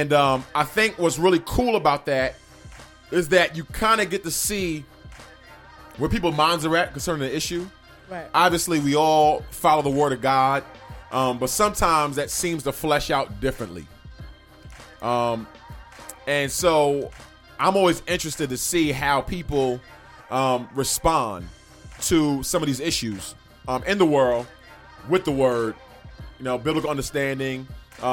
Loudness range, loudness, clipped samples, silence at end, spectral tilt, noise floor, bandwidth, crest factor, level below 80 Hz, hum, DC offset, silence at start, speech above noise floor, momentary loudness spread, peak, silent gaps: 5 LU; -22 LUFS; under 0.1%; 0 s; -4 dB/octave; -46 dBFS; 17.5 kHz; 20 dB; -42 dBFS; none; under 0.1%; 0 s; 24 dB; 17 LU; -2 dBFS; none